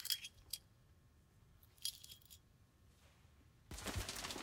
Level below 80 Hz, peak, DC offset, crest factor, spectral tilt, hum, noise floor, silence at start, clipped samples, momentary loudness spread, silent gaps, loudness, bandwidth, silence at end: -62 dBFS; -20 dBFS; under 0.1%; 32 dB; -2 dB/octave; none; -69 dBFS; 0 s; under 0.1%; 25 LU; none; -47 LUFS; 17.5 kHz; 0 s